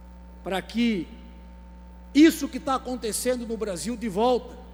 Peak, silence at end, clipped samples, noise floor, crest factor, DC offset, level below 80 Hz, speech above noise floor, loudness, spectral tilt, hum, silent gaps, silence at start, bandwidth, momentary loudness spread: -8 dBFS; 0 s; under 0.1%; -44 dBFS; 18 dB; under 0.1%; -46 dBFS; 20 dB; -25 LUFS; -4.5 dB/octave; none; none; 0 s; over 20 kHz; 13 LU